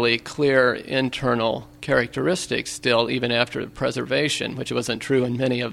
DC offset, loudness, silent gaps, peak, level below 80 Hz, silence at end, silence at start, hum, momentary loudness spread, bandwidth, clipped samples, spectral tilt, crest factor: under 0.1%; -22 LUFS; none; -2 dBFS; -52 dBFS; 0 s; 0 s; none; 6 LU; 15.5 kHz; under 0.1%; -4.5 dB/octave; 20 dB